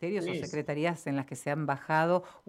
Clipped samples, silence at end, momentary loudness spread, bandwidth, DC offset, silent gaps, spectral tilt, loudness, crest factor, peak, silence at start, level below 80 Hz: under 0.1%; 0.1 s; 7 LU; 14.5 kHz; under 0.1%; none; -6 dB/octave; -32 LUFS; 18 dB; -14 dBFS; 0 s; -72 dBFS